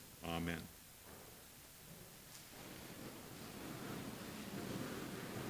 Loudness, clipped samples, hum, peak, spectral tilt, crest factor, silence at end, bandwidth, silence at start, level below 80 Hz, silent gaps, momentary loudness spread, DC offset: -49 LUFS; under 0.1%; none; -26 dBFS; -4.5 dB/octave; 24 dB; 0 s; 16 kHz; 0 s; -66 dBFS; none; 12 LU; under 0.1%